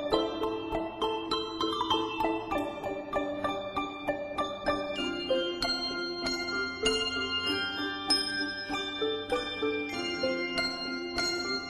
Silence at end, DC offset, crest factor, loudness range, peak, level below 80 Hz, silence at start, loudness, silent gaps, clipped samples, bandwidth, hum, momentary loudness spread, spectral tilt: 0 s; under 0.1%; 20 dB; 3 LU; -12 dBFS; -54 dBFS; 0 s; -31 LUFS; none; under 0.1%; 13.5 kHz; none; 5 LU; -3 dB/octave